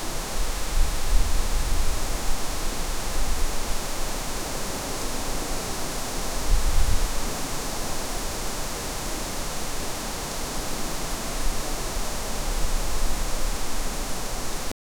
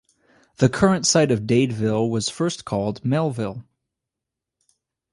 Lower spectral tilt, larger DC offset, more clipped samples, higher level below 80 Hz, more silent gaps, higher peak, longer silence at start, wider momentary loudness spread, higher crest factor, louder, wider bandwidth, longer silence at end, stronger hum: second, -3 dB/octave vs -5 dB/octave; neither; neither; first, -26 dBFS vs -52 dBFS; neither; second, -6 dBFS vs -2 dBFS; second, 0 s vs 0.6 s; second, 3 LU vs 8 LU; about the same, 16 dB vs 20 dB; second, -29 LUFS vs -21 LUFS; first, 19.5 kHz vs 11.5 kHz; second, 0.3 s vs 1.5 s; neither